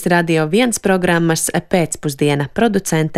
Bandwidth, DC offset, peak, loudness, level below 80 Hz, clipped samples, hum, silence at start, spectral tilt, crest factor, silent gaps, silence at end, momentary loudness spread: 15.5 kHz; under 0.1%; -2 dBFS; -16 LUFS; -46 dBFS; under 0.1%; none; 0 s; -5 dB/octave; 14 dB; none; 0 s; 3 LU